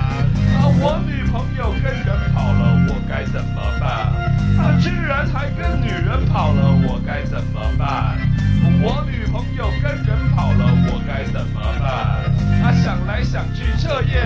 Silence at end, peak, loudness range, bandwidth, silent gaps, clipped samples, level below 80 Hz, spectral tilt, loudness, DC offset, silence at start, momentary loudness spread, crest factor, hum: 0 s; -2 dBFS; 1 LU; 7.8 kHz; none; under 0.1%; -24 dBFS; -8 dB/octave; -18 LUFS; under 0.1%; 0 s; 7 LU; 14 dB; none